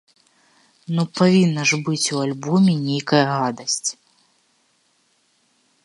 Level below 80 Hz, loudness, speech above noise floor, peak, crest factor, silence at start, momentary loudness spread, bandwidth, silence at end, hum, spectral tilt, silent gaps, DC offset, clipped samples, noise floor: -68 dBFS; -19 LUFS; 45 dB; -2 dBFS; 20 dB; 0.9 s; 8 LU; 11.5 kHz; 1.9 s; none; -4.5 dB/octave; none; under 0.1%; under 0.1%; -64 dBFS